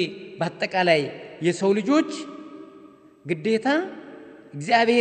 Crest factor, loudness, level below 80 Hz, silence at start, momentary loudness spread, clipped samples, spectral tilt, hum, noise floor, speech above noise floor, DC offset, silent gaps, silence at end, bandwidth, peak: 20 dB; -23 LUFS; -72 dBFS; 0 s; 22 LU; under 0.1%; -5 dB/octave; none; -49 dBFS; 27 dB; under 0.1%; none; 0 s; 9 kHz; -4 dBFS